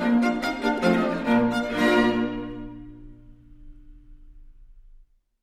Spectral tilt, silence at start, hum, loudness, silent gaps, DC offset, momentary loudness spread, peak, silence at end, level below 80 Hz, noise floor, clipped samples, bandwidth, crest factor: -6 dB/octave; 0 s; none; -23 LUFS; none; under 0.1%; 18 LU; -8 dBFS; 0.65 s; -46 dBFS; -53 dBFS; under 0.1%; 13.5 kHz; 18 dB